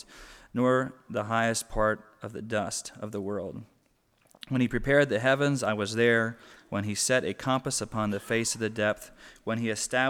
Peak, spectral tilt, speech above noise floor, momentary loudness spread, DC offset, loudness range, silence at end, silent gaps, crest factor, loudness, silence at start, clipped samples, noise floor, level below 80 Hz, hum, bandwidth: -8 dBFS; -4 dB/octave; 40 dB; 13 LU; under 0.1%; 5 LU; 0 s; none; 20 dB; -28 LUFS; 0.1 s; under 0.1%; -68 dBFS; -50 dBFS; none; 17.5 kHz